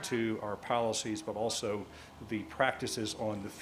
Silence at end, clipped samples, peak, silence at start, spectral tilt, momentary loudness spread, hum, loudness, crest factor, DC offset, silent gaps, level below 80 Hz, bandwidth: 0 s; under 0.1%; -14 dBFS; 0 s; -3.5 dB/octave; 9 LU; none; -35 LUFS; 22 dB; under 0.1%; none; -62 dBFS; 15.5 kHz